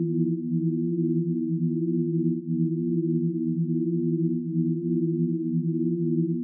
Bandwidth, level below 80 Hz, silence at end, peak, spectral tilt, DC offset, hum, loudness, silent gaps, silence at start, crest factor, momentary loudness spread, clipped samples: 0.4 kHz; under -90 dBFS; 0 s; -14 dBFS; -18 dB/octave; under 0.1%; none; -26 LUFS; none; 0 s; 12 dB; 1 LU; under 0.1%